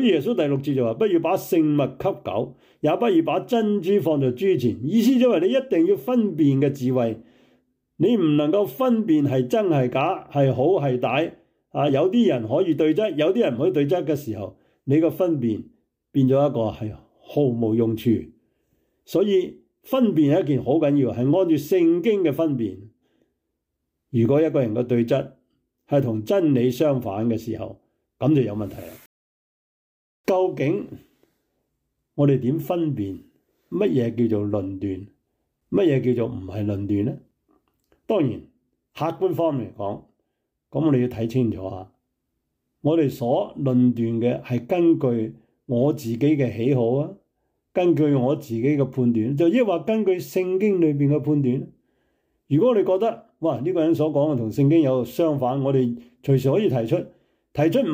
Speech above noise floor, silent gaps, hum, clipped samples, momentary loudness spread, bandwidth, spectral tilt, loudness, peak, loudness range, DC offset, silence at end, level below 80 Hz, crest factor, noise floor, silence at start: 58 dB; 29.06-30.24 s; none; under 0.1%; 10 LU; 16 kHz; -8 dB/octave; -22 LUFS; -8 dBFS; 5 LU; under 0.1%; 0 s; -62 dBFS; 14 dB; -79 dBFS; 0 s